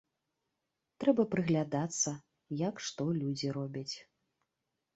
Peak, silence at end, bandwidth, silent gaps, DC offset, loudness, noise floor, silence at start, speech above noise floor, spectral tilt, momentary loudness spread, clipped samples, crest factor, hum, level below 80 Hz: -14 dBFS; 0.95 s; 8.2 kHz; none; under 0.1%; -34 LUFS; -86 dBFS; 1 s; 53 dB; -5 dB/octave; 12 LU; under 0.1%; 22 dB; none; -74 dBFS